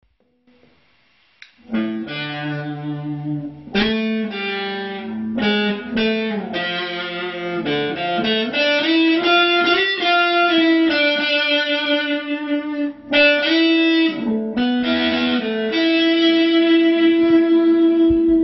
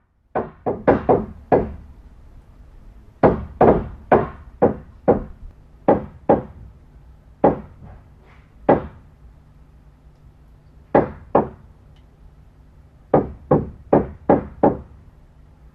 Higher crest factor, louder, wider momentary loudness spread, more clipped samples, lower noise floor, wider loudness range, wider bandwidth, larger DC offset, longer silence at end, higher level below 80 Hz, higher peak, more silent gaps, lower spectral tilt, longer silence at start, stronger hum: second, 14 dB vs 22 dB; first, -17 LUFS vs -20 LUFS; about the same, 11 LU vs 13 LU; neither; first, -59 dBFS vs -48 dBFS; about the same, 8 LU vs 6 LU; first, 6 kHz vs 5.4 kHz; neither; second, 0 s vs 0.9 s; second, -50 dBFS vs -40 dBFS; second, -4 dBFS vs 0 dBFS; neither; second, -2 dB/octave vs -11 dB/octave; first, 1.7 s vs 0.35 s; neither